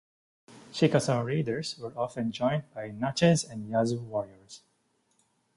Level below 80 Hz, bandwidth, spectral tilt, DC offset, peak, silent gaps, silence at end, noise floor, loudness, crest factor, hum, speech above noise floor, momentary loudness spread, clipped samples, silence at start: -64 dBFS; 11.5 kHz; -5.5 dB/octave; under 0.1%; -8 dBFS; none; 1 s; -72 dBFS; -29 LUFS; 22 dB; none; 44 dB; 16 LU; under 0.1%; 0.5 s